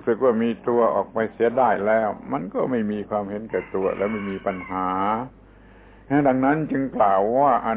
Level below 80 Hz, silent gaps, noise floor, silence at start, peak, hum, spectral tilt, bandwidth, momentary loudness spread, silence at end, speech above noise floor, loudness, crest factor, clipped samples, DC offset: -54 dBFS; none; -48 dBFS; 0 s; -6 dBFS; none; -11 dB/octave; 4 kHz; 9 LU; 0 s; 26 dB; -22 LUFS; 16 dB; under 0.1%; under 0.1%